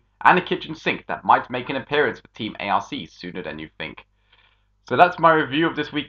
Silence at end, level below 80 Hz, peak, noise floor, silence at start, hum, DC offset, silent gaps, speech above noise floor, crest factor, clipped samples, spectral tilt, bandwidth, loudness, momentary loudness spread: 0 s; -58 dBFS; 0 dBFS; -60 dBFS; 0.2 s; 50 Hz at -55 dBFS; under 0.1%; none; 39 dB; 22 dB; under 0.1%; -6 dB/octave; 7.2 kHz; -21 LUFS; 16 LU